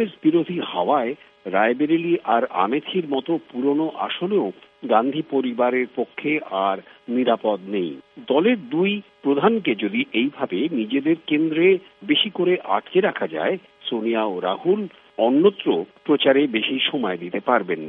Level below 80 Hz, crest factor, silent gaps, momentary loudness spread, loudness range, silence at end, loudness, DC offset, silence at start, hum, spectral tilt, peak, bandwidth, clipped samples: -74 dBFS; 18 dB; none; 7 LU; 2 LU; 0 s; -21 LUFS; under 0.1%; 0 s; none; -8.5 dB/octave; -4 dBFS; 4 kHz; under 0.1%